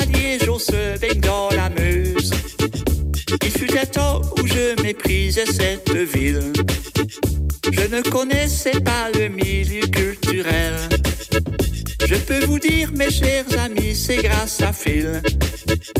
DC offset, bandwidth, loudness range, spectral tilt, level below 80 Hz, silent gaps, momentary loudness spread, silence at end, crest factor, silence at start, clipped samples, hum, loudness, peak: under 0.1%; 16.5 kHz; 1 LU; -4.5 dB/octave; -26 dBFS; none; 4 LU; 0 s; 12 dB; 0 s; under 0.1%; none; -19 LUFS; -6 dBFS